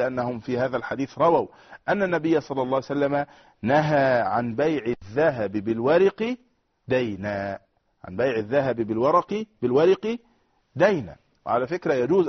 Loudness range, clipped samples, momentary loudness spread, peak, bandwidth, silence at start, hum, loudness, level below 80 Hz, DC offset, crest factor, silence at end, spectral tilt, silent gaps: 3 LU; under 0.1%; 11 LU; -6 dBFS; 6.4 kHz; 0 s; none; -24 LUFS; -60 dBFS; under 0.1%; 18 dB; 0 s; -5.5 dB/octave; none